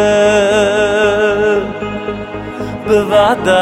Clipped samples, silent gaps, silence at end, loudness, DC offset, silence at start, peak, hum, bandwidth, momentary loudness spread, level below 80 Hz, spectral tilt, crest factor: under 0.1%; none; 0 s; -13 LUFS; under 0.1%; 0 s; 0 dBFS; none; 13 kHz; 13 LU; -38 dBFS; -4.5 dB/octave; 12 dB